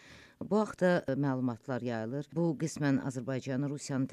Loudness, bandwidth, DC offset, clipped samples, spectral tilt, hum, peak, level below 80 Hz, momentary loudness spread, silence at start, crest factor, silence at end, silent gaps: -33 LUFS; 12.5 kHz; under 0.1%; under 0.1%; -6.5 dB/octave; none; -16 dBFS; -70 dBFS; 8 LU; 0.05 s; 16 dB; 0 s; none